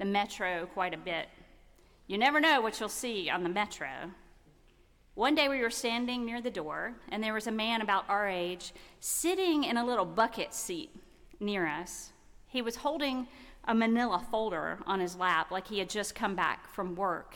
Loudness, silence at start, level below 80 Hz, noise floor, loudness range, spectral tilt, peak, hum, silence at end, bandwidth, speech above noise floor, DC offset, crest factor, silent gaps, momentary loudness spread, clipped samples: -32 LUFS; 0 s; -60 dBFS; -62 dBFS; 3 LU; -3 dB/octave; -16 dBFS; none; 0 s; 18 kHz; 30 dB; under 0.1%; 18 dB; none; 12 LU; under 0.1%